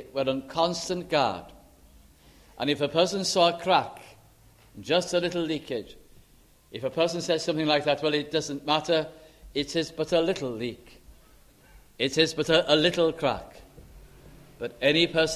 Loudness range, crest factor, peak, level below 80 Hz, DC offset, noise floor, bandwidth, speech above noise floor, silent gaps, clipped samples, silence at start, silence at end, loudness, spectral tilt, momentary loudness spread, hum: 3 LU; 22 dB; -6 dBFS; -56 dBFS; under 0.1%; -58 dBFS; 15 kHz; 32 dB; none; under 0.1%; 0 s; 0 s; -26 LUFS; -4 dB/octave; 13 LU; none